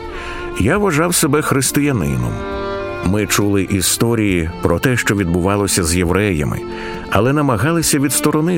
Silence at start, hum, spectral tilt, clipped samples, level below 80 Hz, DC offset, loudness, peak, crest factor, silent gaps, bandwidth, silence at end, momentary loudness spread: 0 s; none; -4.5 dB/octave; under 0.1%; -34 dBFS; under 0.1%; -16 LUFS; 0 dBFS; 16 dB; none; 16.5 kHz; 0 s; 9 LU